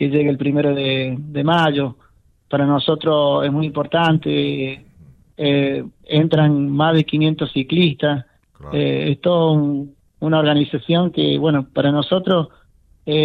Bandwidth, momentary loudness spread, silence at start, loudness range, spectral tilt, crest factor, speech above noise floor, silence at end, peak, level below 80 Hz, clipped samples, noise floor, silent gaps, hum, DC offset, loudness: 4.7 kHz; 9 LU; 0 s; 1 LU; -8.5 dB/octave; 14 dB; 30 dB; 0 s; -4 dBFS; -54 dBFS; under 0.1%; -48 dBFS; none; none; under 0.1%; -18 LUFS